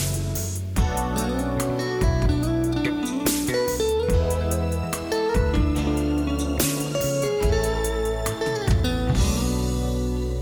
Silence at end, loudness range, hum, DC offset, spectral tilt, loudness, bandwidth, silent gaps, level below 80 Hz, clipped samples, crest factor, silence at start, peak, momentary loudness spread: 0 s; 1 LU; none; under 0.1%; -5.5 dB/octave; -24 LUFS; over 20 kHz; none; -28 dBFS; under 0.1%; 18 dB; 0 s; -6 dBFS; 4 LU